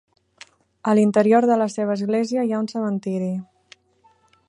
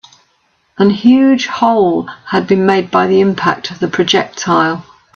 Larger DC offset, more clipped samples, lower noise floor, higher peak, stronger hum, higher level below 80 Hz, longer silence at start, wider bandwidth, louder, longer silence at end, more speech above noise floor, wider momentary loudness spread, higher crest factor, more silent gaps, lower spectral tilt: neither; neither; about the same, -60 dBFS vs -58 dBFS; second, -4 dBFS vs 0 dBFS; neither; second, -72 dBFS vs -54 dBFS; about the same, 0.85 s vs 0.8 s; first, 10.5 kHz vs 7.2 kHz; second, -21 LUFS vs -12 LUFS; first, 1.05 s vs 0.35 s; second, 40 dB vs 47 dB; about the same, 10 LU vs 8 LU; first, 18 dB vs 12 dB; neither; first, -7 dB/octave vs -5.5 dB/octave